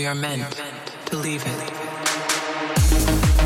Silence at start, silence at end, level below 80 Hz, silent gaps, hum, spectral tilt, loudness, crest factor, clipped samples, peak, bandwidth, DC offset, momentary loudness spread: 0 s; 0 s; -26 dBFS; none; none; -4 dB/octave; -23 LUFS; 16 dB; under 0.1%; -4 dBFS; 17 kHz; under 0.1%; 11 LU